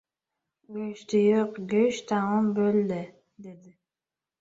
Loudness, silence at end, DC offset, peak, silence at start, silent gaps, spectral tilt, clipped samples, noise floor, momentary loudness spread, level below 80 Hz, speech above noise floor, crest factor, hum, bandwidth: -26 LUFS; 0.7 s; under 0.1%; -12 dBFS; 0.7 s; none; -6.5 dB/octave; under 0.1%; under -90 dBFS; 21 LU; -72 dBFS; over 64 dB; 16 dB; none; 7.8 kHz